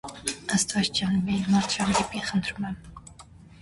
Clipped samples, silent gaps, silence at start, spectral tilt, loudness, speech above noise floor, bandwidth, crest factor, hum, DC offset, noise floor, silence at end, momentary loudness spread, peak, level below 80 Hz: under 0.1%; none; 0.05 s; -3.5 dB/octave; -26 LUFS; 23 dB; 11.5 kHz; 18 dB; none; under 0.1%; -49 dBFS; 0.4 s; 12 LU; -8 dBFS; -50 dBFS